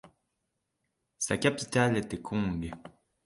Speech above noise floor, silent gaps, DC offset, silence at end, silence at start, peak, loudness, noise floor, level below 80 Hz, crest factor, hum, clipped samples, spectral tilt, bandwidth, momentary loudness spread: 52 dB; none; under 0.1%; 0.35 s; 0.05 s; -12 dBFS; -30 LUFS; -82 dBFS; -54 dBFS; 22 dB; none; under 0.1%; -4.5 dB/octave; 11.5 kHz; 11 LU